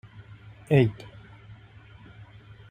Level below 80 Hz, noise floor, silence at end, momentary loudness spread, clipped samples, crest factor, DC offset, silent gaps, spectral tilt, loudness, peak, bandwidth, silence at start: -56 dBFS; -50 dBFS; 1.75 s; 27 LU; under 0.1%; 22 dB; under 0.1%; none; -8.5 dB/octave; -24 LUFS; -8 dBFS; 9.4 kHz; 0.2 s